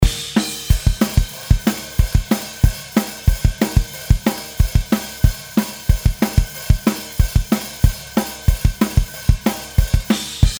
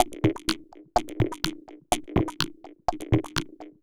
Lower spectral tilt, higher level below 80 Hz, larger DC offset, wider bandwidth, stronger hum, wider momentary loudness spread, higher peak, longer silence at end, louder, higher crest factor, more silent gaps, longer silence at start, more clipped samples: about the same, -5.5 dB/octave vs -5 dB/octave; first, -20 dBFS vs -42 dBFS; neither; about the same, over 20 kHz vs over 20 kHz; neither; second, 4 LU vs 7 LU; first, 0 dBFS vs -4 dBFS; second, 0 s vs 0.15 s; first, -19 LUFS vs -29 LUFS; second, 18 dB vs 24 dB; neither; about the same, 0 s vs 0 s; neither